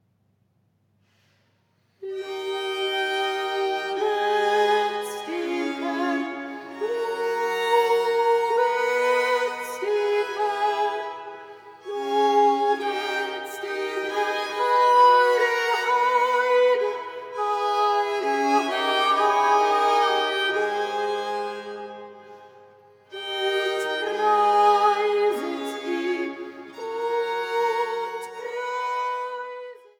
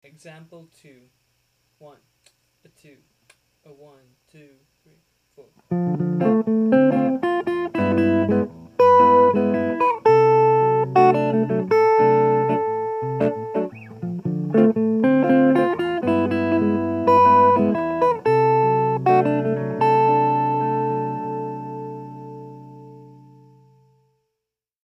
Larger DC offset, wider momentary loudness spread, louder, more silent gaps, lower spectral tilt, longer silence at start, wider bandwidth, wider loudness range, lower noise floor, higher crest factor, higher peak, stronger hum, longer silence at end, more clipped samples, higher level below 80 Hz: neither; about the same, 14 LU vs 14 LU; second, -23 LUFS vs -19 LUFS; neither; second, -2 dB/octave vs -9 dB/octave; first, 2 s vs 0.25 s; first, 19 kHz vs 7.4 kHz; second, 7 LU vs 10 LU; second, -67 dBFS vs -84 dBFS; about the same, 16 dB vs 16 dB; second, -8 dBFS vs -4 dBFS; neither; second, 0.25 s vs 1.9 s; neither; second, under -90 dBFS vs -66 dBFS